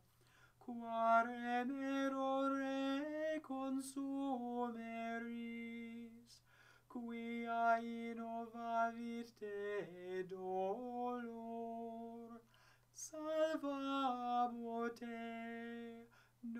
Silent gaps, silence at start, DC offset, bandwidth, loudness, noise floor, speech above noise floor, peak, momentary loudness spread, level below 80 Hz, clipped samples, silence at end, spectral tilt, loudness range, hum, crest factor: none; 0.6 s; under 0.1%; 15.5 kHz; -43 LUFS; -70 dBFS; 28 dB; -24 dBFS; 14 LU; -84 dBFS; under 0.1%; 0 s; -4.5 dB/octave; 7 LU; none; 20 dB